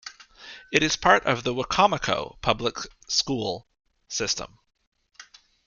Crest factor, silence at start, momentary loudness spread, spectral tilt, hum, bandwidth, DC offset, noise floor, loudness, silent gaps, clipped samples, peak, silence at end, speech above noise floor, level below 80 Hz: 24 dB; 0.05 s; 17 LU; -3 dB/octave; none; 11 kHz; under 0.1%; -51 dBFS; -24 LUFS; 4.87-4.92 s; under 0.1%; -2 dBFS; 0.45 s; 27 dB; -50 dBFS